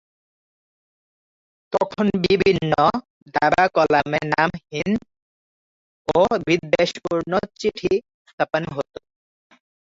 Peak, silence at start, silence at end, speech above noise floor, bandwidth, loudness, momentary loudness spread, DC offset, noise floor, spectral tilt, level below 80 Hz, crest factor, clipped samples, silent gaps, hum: -2 dBFS; 1.7 s; 1 s; over 70 dB; 7.8 kHz; -21 LUFS; 10 LU; under 0.1%; under -90 dBFS; -6 dB/octave; -52 dBFS; 20 dB; under 0.1%; 3.10-3.26 s, 5.22-6.05 s, 8.14-8.25 s, 8.33-8.38 s; none